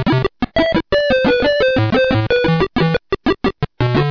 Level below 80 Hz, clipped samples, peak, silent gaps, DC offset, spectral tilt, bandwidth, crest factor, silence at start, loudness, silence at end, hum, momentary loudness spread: -34 dBFS; under 0.1%; -2 dBFS; none; under 0.1%; -7.5 dB/octave; 5.4 kHz; 14 dB; 0 s; -16 LUFS; 0 s; none; 5 LU